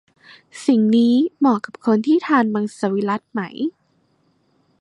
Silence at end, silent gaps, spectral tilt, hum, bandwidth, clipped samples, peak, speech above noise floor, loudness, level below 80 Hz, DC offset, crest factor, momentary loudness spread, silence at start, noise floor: 1.1 s; none; -6.5 dB/octave; none; 11 kHz; under 0.1%; -4 dBFS; 45 dB; -19 LUFS; -68 dBFS; under 0.1%; 16 dB; 11 LU; 0.55 s; -63 dBFS